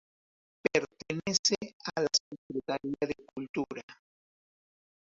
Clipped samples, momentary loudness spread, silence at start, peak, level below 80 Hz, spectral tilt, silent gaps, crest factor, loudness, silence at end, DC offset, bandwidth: under 0.1%; 12 LU; 0.75 s; -10 dBFS; -70 dBFS; -2.5 dB/octave; 1.39-1.43 s, 1.73-1.80 s, 2.20-2.31 s, 2.38-2.50 s, 3.49-3.54 s, 3.83-3.88 s; 24 dB; -32 LUFS; 1.15 s; under 0.1%; 8 kHz